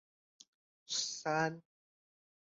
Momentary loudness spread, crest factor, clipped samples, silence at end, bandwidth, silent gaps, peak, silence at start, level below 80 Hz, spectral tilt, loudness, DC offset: 6 LU; 20 dB; under 0.1%; 0.8 s; 8.2 kHz; none; -22 dBFS; 0.9 s; -86 dBFS; -2.5 dB/octave; -36 LUFS; under 0.1%